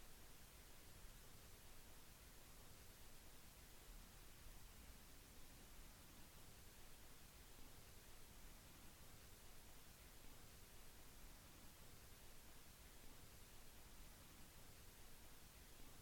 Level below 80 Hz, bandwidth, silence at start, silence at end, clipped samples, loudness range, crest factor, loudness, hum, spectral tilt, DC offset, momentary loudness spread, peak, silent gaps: -66 dBFS; 17.5 kHz; 0 s; 0 s; under 0.1%; 0 LU; 14 dB; -64 LUFS; none; -3 dB/octave; under 0.1%; 1 LU; -48 dBFS; none